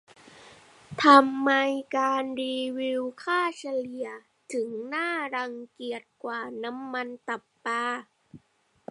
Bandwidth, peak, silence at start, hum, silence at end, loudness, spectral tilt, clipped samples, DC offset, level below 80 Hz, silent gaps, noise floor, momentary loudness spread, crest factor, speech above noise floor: 11.5 kHz; -2 dBFS; 0.35 s; none; 0.55 s; -27 LUFS; -3.5 dB/octave; under 0.1%; under 0.1%; -76 dBFS; none; -68 dBFS; 15 LU; 26 dB; 41 dB